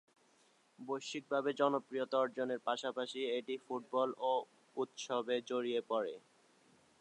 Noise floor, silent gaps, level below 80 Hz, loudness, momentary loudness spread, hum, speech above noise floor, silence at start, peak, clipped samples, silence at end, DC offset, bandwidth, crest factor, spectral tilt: -71 dBFS; none; under -90 dBFS; -38 LUFS; 8 LU; none; 33 dB; 0.8 s; -20 dBFS; under 0.1%; 0.85 s; under 0.1%; 10.5 kHz; 20 dB; -4 dB/octave